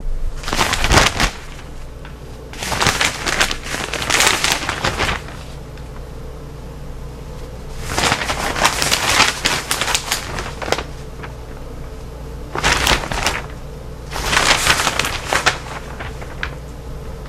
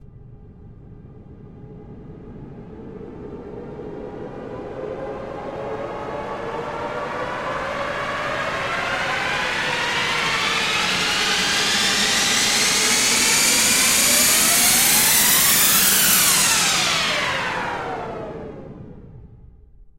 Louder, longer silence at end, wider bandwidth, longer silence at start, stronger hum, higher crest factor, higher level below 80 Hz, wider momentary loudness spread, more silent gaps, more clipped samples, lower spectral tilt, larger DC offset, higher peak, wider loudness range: about the same, -17 LUFS vs -17 LUFS; second, 0 s vs 0.15 s; about the same, 17 kHz vs 16 kHz; about the same, 0 s vs 0.05 s; neither; about the same, 20 dB vs 20 dB; first, -30 dBFS vs -48 dBFS; about the same, 20 LU vs 21 LU; neither; neither; first, -2 dB/octave vs -0.5 dB/octave; neither; about the same, 0 dBFS vs -2 dBFS; second, 6 LU vs 20 LU